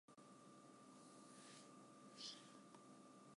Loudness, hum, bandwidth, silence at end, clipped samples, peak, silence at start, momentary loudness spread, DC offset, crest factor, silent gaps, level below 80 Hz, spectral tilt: -61 LUFS; none; 11.5 kHz; 0 s; under 0.1%; -40 dBFS; 0.1 s; 10 LU; under 0.1%; 22 dB; none; under -90 dBFS; -3 dB/octave